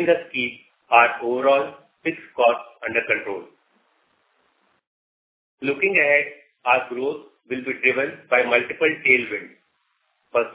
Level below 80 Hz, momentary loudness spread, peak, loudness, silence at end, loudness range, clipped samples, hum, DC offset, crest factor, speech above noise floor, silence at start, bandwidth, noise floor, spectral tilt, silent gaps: -70 dBFS; 13 LU; -2 dBFS; -21 LUFS; 0 s; 6 LU; under 0.1%; none; under 0.1%; 22 dB; 48 dB; 0 s; 4 kHz; -69 dBFS; -7.5 dB/octave; 4.87-5.58 s